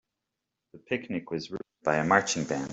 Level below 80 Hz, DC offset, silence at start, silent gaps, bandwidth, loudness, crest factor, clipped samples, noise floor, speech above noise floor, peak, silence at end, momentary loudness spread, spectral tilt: -66 dBFS; under 0.1%; 0.75 s; none; 8.2 kHz; -28 LUFS; 24 dB; under 0.1%; -86 dBFS; 57 dB; -6 dBFS; 0 s; 12 LU; -4 dB/octave